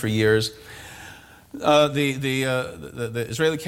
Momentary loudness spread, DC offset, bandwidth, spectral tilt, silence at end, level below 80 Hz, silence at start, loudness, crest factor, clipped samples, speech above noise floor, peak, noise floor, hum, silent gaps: 22 LU; under 0.1%; 17 kHz; -5 dB/octave; 0 s; -54 dBFS; 0 s; -22 LUFS; 18 dB; under 0.1%; 23 dB; -6 dBFS; -45 dBFS; none; none